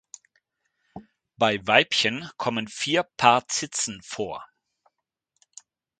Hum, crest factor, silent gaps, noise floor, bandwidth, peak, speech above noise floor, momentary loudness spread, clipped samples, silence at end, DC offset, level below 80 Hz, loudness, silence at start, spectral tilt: none; 26 dB; none; -79 dBFS; 9.4 kHz; -2 dBFS; 55 dB; 13 LU; under 0.1%; 1.55 s; under 0.1%; -66 dBFS; -23 LUFS; 0.95 s; -2.5 dB/octave